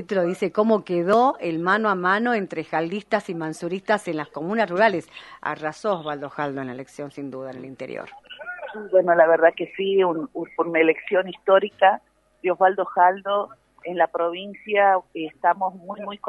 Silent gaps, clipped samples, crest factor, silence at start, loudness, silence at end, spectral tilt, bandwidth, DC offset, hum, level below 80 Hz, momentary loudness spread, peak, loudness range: none; under 0.1%; 20 dB; 0 s; -22 LUFS; 0 s; -6 dB/octave; 11.5 kHz; under 0.1%; none; -70 dBFS; 16 LU; -2 dBFS; 6 LU